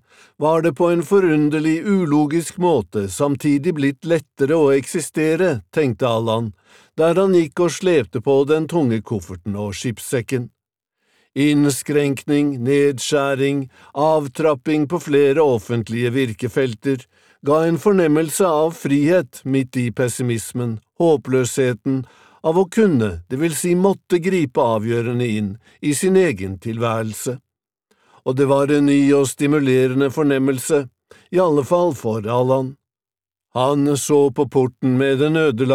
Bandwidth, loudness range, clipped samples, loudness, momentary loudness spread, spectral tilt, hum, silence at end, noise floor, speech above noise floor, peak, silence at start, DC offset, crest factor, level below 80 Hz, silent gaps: 16 kHz; 3 LU; under 0.1%; -18 LUFS; 9 LU; -6 dB/octave; none; 0 s; under -90 dBFS; over 72 dB; -2 dBFS; 0.4 s; 0.1%; 16 dB; -58 dBFS; none